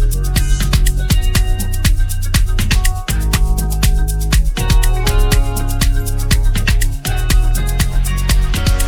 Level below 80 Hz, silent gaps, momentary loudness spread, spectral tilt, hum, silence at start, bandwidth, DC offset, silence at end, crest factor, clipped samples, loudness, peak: -14 dBFS; none; 3 LU; -4 dB/octave; none; 0 s; 19.5 kHz; under 0.1%; 0 s; 12 dB; under 0.1%; -16 LUFS; 0 dBFS